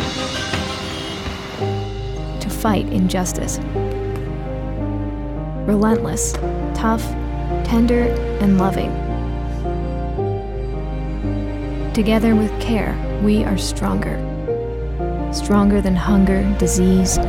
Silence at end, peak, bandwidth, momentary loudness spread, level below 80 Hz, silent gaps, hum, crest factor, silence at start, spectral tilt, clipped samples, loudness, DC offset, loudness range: 0 s; -4 dBFS; 17 kHz; 10 LU; -26 dBFS; none; none; 16 dB; 0 s; -5.5 dB/octave; under 0.1%; -20 LUFS; under 0.1%; 4 LU